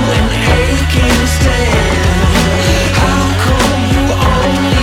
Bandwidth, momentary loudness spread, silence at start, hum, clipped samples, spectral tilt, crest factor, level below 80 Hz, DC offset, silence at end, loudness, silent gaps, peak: 16.5 kHz; 1 LU; 0 s; none; under 0.1%; -5 dB/octave; 10 dB; -16 dBFS; under 0.1%; 0 s; -11 LUFS; none; 0 dBFS